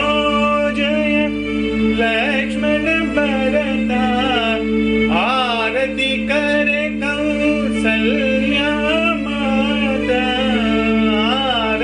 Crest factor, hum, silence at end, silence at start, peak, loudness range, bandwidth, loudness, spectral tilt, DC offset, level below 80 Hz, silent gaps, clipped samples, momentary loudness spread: 12 dB; none; 0 s; 0 s; -6 dBFS; 0 LU; 10.5 kHz; -16 LUFS; -5.5 dB/octave; under 0.1%; -36 dBFS; none; under 0.1%; 2 LU